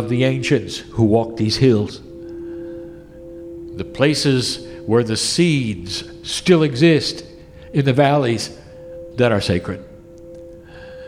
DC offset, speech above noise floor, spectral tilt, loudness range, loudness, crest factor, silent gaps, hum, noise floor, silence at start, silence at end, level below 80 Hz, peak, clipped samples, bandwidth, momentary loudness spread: under 0.1%; 22 dB; -5.5 dB/octave; 4 LU; -18 LUFS; 18 dB; none; none; -39 dBFS; 0 s; 0 s; -46 dBFS; -2 dBFS; under 0.1%; 15 kHz; 22 LU